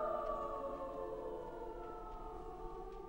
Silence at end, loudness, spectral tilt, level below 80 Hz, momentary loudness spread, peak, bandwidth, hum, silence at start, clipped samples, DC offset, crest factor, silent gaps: 0 s; -45 LUFS; -7 dB/octave; -54 dBFS; 9 LU; -28 dBFS; 16 kHz; none; 0 s; under 0.1%; under 0.1%; 16 dB; none